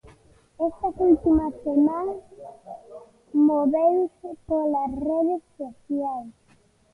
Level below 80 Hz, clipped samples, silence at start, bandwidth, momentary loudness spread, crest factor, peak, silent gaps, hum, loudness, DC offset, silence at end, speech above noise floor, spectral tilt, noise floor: -50 dBFS; under 0.1%; 0.6 s; 2.8 kHz; 21 LU; 16 dB; -8 dBFS; none; none; -23 LUFS; under 0.1%; 0.6 s; 37 dB; -10 dB/octave; -60 dBFS